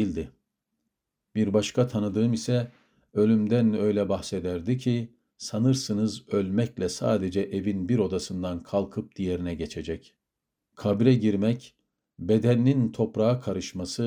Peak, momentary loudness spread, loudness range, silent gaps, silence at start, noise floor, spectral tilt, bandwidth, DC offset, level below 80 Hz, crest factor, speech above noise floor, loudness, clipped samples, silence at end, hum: -6 dBFS; 12 LU; 4 LU; none; 0 s; -85 dBFS; -7 dB/octave; 13 kHz; under 0.1%; -58 dBFS; 20 dB; 60 dB; -26 LUFS; under 0.1%; 0 s; none